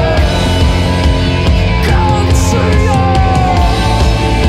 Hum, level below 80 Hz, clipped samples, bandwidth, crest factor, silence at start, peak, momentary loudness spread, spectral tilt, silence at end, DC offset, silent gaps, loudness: none; -14 dBFS; under 0.1%; 14 kHz; 10 dB; 0 s; 0 dBFS; 1 LU; -6 dB/octave; 0 s; under 0.1%; none; -11 LUFS